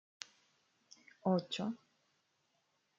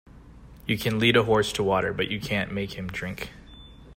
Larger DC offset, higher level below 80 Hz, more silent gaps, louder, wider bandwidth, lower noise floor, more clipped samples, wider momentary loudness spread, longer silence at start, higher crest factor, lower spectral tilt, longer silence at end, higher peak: neither; second, -86 dBFS vs -48 dBFS; neither; second, -38 LUFS vs -25 LUFS; second, 7.6 kHz vs 16 kHz; first, -80 dBFS vs -47 dBFS; neither; first, 17 LU vs 14 LU; first, 1.25 s vs 0.15 s; about the same, 24 dB vs 22 dB; about the same, -6 dB/octave vs -5 dB/octave; first, 1.25 s vs 0 s; second, -20 dBFS vs -6 dBFS